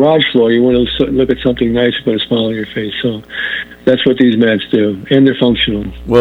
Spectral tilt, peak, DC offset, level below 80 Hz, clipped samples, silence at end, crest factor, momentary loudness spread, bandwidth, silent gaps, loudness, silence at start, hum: -7.5 dB/octave; 0 dBFS; under 0.1%; -36 dBFS; under 0.1%; 0 s; 12 dB; 8 LU; 4.5 kHz; none; -13 LUFS; 0 s; none